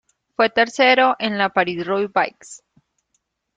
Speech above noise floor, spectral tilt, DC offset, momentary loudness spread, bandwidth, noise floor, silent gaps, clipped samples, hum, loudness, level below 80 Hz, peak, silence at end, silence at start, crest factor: 53 dB; -4 dB/octave; under 0.1%; 8 LU; 9.2 kHz; -71 dBFS; none; under 0.1%; none; -18 LUFS; -66 dBFS; -2 dBFS; 1 s; 0.4 s; 18 dB